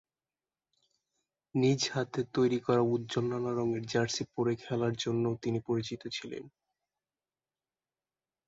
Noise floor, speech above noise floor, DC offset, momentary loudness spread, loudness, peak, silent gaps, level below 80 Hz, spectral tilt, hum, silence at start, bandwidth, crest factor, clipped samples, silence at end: under -90 dBFS; over 59 dB; under 0.1%; 9 LU; -32 LUFS; -16 dBFS; none; -70 dBFS; -5.5 dB/octave; none; 1.55 s; 7.8 kHz; 18 dB; under 0.1%; 2 s